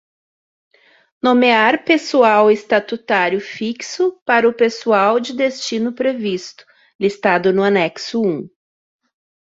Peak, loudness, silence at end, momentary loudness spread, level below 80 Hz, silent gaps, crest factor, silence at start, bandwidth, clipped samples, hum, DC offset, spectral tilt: -2 dBFS; -16 LUFS; 1.05 s; 10 LU; -64 dBFS; 4.22-4.26 s, 6.95-6.99 s; 16 dB; 1.25 s; 7.8 kHz; under 0.1%; none; under 0.1%; -4.5 dB/octave